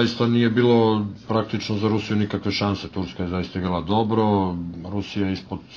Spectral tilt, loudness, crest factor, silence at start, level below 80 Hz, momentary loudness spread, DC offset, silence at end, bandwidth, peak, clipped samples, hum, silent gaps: -7 dB/octave; -23 LUFS; 16 dB; 0 s; -50 dBFS; 10 LU; under 0.1%; 0 s; 7.2 kHz; -6 dBFS; under 0.1%; none; none